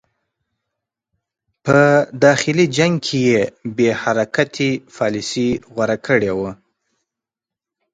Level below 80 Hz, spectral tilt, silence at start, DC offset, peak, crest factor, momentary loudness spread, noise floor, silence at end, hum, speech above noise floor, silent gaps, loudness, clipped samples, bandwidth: -54 dBFS; -5.5 dB/octave; 1.65 s; under 0.1%; 0 dBFS; 18 dB; 8 LU; -87 dBFS; 1.4 s; none; 70 dB; none; -17 LUFS; under 0.1%; 9.4 kHz